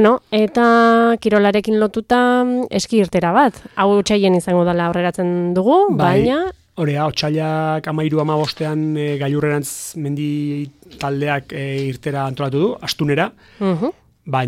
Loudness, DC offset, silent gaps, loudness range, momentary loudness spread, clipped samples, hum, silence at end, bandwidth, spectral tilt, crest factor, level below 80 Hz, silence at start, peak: -17 LUFS; under 0.1%; none; 7 LU; 9 LU; under 0.1%; none; 0 s; 16 kHz; -6 dB/octave; 14 dB; -50 dBFS; 0 s; -2 dBFS